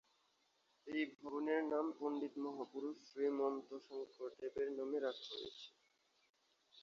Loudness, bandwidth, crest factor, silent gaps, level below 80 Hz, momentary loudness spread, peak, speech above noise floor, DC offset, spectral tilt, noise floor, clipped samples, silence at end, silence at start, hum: -44 LUFS; 7.2 kHz; 18 dB; 6.30-6.34 s; -86 dBFS; 12 LU; -26 dBFS; 36 dB; under 0.1%; -2 dB/octave; -79 dBFS; under 0.1%; 0 s; 0.85 s; none